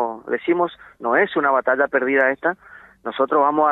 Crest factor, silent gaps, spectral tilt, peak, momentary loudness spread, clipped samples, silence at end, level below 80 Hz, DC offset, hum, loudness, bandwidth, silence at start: 16 dB; none; -7.5 dB/octave; -4 dBFS; 11 LU; under 0.1%; 0 s; -64 dBFS; under 0.1%; none; -19 LUFS; 4.1 kHz; 0 s